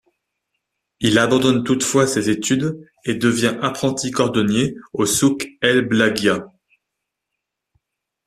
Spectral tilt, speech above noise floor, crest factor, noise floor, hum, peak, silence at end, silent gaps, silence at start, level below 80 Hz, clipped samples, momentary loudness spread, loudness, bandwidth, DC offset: -4 dB/octave; 62 dB; 18 dB; -80 dBFS; none; -2 dBFS; 1.8 s; none; 1 s; -54 dBFS; under 0.1%; 7 LU; -18 LUFS; 14.5 kHz; under 0.1%